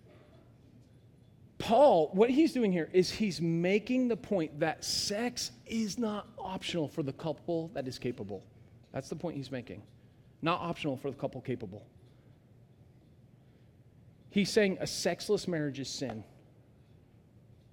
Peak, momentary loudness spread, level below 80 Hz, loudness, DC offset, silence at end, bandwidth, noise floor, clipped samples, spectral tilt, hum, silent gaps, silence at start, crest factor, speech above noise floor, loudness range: -12 dBFS; 15 LU; -64 dBFS; -32 LUFS; under 0.1%; 1.5 s; 17 kHz; -60 dBFS; under 0.1%; -5 dB/octave; none; none; 1.6 s; 20 dB; 29 dB; 11 LU